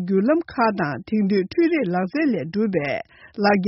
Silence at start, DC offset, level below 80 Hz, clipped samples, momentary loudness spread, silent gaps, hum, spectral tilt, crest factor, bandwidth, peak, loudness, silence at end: 0 s; under 0.1%; -58 dBFS; under 0.1%; 6 LU; none; none; -6 dB/octave; 16 dB; 6 kHz; -6 dBFS; -22 LUFS; 0 s